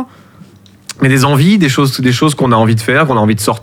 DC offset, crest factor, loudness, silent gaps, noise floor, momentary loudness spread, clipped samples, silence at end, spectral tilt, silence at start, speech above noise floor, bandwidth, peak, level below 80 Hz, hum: under 0.1%; 12 dB; -10 LUFS; none; -39 dBFS; 4 LU; under 0.1%; 0.05 s; -5.5 dB/octave; 0 s; 30 dB; 16.5 kHz; 0 dBFS; -46 dBFS; none